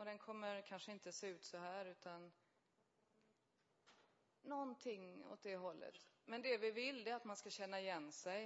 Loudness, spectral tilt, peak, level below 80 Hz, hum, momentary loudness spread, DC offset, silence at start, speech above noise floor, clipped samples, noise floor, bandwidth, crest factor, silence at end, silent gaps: -50 LUFS; -2 dB/octave; -30 dBFS; under -90 dBFS; none; 13 LU; under 0.1%; 0 s; 34 dB; under 0.1%; -83 dBFS; 7.6 kHz; 22 dB; 0 s; none